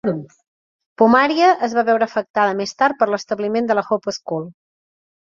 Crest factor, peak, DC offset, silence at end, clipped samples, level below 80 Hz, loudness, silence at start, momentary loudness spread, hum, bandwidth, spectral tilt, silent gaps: 18 dB; -2 dBFS; under 0.1%; 0.8 s; under 0.1%; -64 dBFS; -18 LUFS; 0.05 s; 12 LU; none; 7.4 kHz; -5 dB/octave; 0.47-0.79 s, 0.86-0.96 s, 2.30-2.34 s